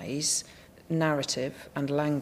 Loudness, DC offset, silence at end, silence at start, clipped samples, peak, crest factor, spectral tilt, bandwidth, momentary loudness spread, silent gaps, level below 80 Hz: -29 LUFS; under 0.1%; 0 s; 0 s; under 0.1%; -14 dBFS; 16 dB; -4 dB/octave; 15.5 kHz; 8 LU; none; -62 dBFS